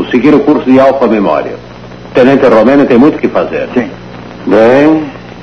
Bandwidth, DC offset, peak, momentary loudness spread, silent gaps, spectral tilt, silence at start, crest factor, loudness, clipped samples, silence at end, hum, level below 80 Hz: 7 kHz; 0.7%; 0 dBFS; 17 LU; none; -7.5 dB/octave; 0 s; 8 dB; -7 LUFS; 4%; 0 s; 60 Hz at -35 dBFS; -40 dBFS